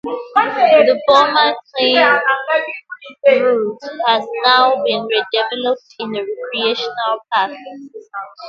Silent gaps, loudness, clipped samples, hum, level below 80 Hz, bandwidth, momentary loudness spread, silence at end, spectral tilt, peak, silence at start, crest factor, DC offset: none; -15 LUFS; under 0.1%; none; -68 dBFS; 7.6 kHz; 15 LU; 0 s; -3.5 dB/octave; 0 dBFS; 0.05 s; 16 dB; under 0.1%